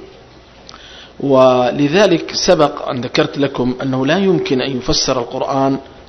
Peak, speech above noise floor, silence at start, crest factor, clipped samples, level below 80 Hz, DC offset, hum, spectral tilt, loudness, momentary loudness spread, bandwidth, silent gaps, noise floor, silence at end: 0 dBFS; 27 dB; 0 s; 16 dB; under 0.1%; -38 dBFS; under 0.1%; none; -4.5 dB/octave; -15 LUFS; 7 LU; 8.4 kHz; none; -41 dBFS; 0.05 s